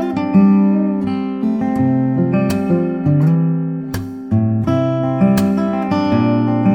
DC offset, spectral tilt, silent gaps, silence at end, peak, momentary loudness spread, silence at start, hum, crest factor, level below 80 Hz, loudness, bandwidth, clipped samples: under 0.1%; -8.5 dB/octave; none; 0 s; -2 dBFS; 7 LU; 0 s; none; 14 dB; -48 dBFS; -16 LUFS; 17 kHz; under 0.1%